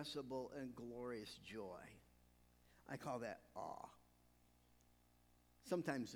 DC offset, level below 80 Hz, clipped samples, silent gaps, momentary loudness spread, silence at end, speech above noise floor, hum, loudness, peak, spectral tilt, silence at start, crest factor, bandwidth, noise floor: under 0.1%; -76 dBFS; under 0.1%; none; 17 LU; 0 s; 25 dB; 60 Hz at -75 dBFS; -50 LUFS; -28 dBFS; -5 dB/octave; 0 s; 24 dB; over 20 kHz; -74 dBFS